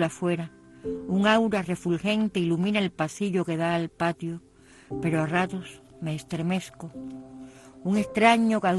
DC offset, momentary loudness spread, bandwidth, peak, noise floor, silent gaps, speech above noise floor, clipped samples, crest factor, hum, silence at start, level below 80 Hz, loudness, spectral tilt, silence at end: under 0.1%; 19 LU; 12.5 kHz; -6 dBFS; -46 dBFS; none; 20 dB; under 0.1%; 20 dB; none; 0 s; -58 dBFS; -26 LUFS; -6 dB/octave; 0 s